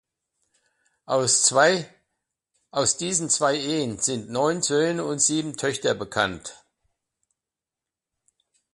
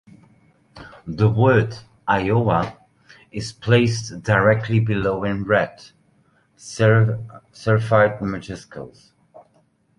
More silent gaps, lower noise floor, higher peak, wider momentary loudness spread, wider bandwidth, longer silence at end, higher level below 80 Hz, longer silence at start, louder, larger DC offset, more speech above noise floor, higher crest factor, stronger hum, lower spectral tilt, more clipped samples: neither; first, -89 dBFS vs -61 dBFS; about the same, -4 dBFS vs -2 dBFS; second, 9 LU vs 18 LU; about the same, 11.5 kHz vs 11 kHz; first, 2.2 s vs 0.6 s; second, -62 dBFS vs -48 dBFS; first, 1.1 s vs 0.75 s; about the same, -22 LUFS vs -20 LUFS; neither; first, 65 dB vs 42 dB; about the same, 22 dB vs 20 dB; neither; second, -2.5 dB/octave vs -7 dB/octave; neither